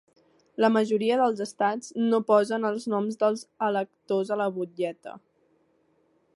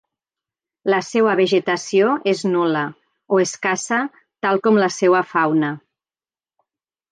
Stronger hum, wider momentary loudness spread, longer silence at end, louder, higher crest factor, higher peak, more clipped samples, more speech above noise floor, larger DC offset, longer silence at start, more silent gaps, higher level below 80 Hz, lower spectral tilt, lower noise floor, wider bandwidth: neither; about the same, 9 LU vs 8 LU; second, 1.15 s vs 1.35 s; second, -26 LUFS vs -19 LUFS; about the same, 20 dB vs 16 dB; second, -8 dBFS vs -4 dBFS; neither; second, 42 dB vs over 72 dB; neither; second, 0.6 s vs 0.85 s; neither; second, -78 dBFS vs -72 dBFS; about the same, -5.5 dB/octave vs -4.5 dB/octave; second, -67 dBFS vs under -90 dBFS; first, 11.5 kHz vs 9.6 kHz